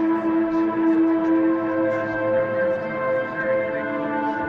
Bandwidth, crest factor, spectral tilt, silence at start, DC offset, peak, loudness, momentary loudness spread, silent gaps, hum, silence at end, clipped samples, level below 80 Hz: 5 kHz; 12 dB; -8.5 dB/octave; 0 s; under 0.1%; -10 dBFS; -22 LUFS; 5 LU; none; none; 0 s; under 0.1%; -60 dBFS